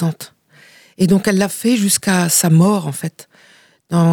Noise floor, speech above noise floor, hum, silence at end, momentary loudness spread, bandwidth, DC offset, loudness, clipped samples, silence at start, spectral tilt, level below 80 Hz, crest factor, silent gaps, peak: -47 dBFS; 32 dB; none; 0 s; 15 LU; 19 kHz; under 0.1%; -15 LUFS; under 0.1%; 0 s; -5 dB/octave; -56 dBFS; 12 dB; none; -4 dBFS